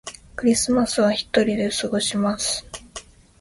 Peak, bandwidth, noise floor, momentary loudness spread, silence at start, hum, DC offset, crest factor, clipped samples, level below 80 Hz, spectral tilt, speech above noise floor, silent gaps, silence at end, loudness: -4 dBFS; 11.5 kHz; -42 dBFS; 17 LU; 0.05 s; none; under 0.1%; 18 dB; under 0.1%; -50 dBFS; -3.5 dB/octave; 21 dB; none; 0.4 s; -21 LUFS